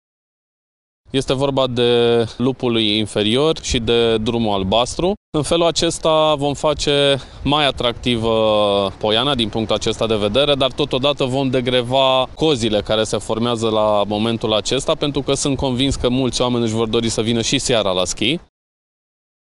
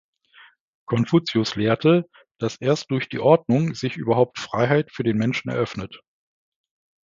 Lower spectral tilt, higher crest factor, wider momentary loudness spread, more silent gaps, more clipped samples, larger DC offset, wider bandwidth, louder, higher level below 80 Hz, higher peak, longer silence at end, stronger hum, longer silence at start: second, -4.5 dB/octave vs -6.5 dB/octave; about the same, 16 dB vs 20 dB; second, 4 LU vs 10 LU; first, 5.17-5.32 s vs 2.31-2.35 s; neither; neither; first, 11.5 kHz vs 7.6 kHz; first, -17 LUFS vs -22 LUFS; first, -38 dBFS vs -58 dBFS; about the same, -2 dBFS vs -2 dBFS; about the same, 1.15 s vs 1.05 s; neither; first, 1.15 s vs 0.9 s